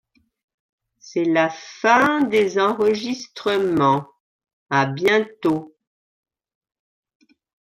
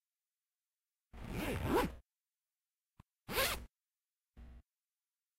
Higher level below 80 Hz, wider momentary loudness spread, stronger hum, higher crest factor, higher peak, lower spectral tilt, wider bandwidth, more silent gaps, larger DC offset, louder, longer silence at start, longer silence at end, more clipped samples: second, -64 dBFS vs -54 dBFS; second, 8 LU vs 25 LU; neither; about the same, 20 dB vs 24 dB; first, -2 dBFS vs -20 dBFS; first, -5.5 dB/octave vs -4 dB/octave; about the same, 15 kHz vs 16 kHz; first, 4.20-4.39 s, 4.53-4.66 s vs none; neither; first, -20 LUFS vs -38 LUFS; about the same, 1.05 s vs 1.15 s; first, 2 s vs 0.75 s; neither